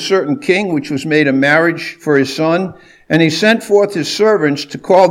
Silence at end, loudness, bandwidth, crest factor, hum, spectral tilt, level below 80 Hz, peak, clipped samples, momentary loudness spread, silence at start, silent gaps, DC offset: 0 s; -13 LUFS; 16 kHz; 12 dB; none; -5 dB/octave; -58 dBFS; 0 dBFS; 0.1%; 7 LU; 0 s; none; under 0.1%